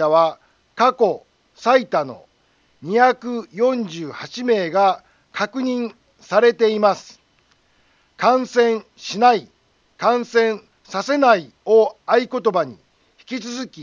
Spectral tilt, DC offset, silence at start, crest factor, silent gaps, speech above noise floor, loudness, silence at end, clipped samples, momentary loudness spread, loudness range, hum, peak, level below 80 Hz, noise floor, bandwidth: -4.5 dB/octave; under 0.1%; 0 s; 18 dB; none; 42 dB; -19 LUFS; 0 s; under 0.1%; 14 LU; 2 LU; none; -2 dBFS; -70 dBFS; -60 dBFS; 7.4 kHz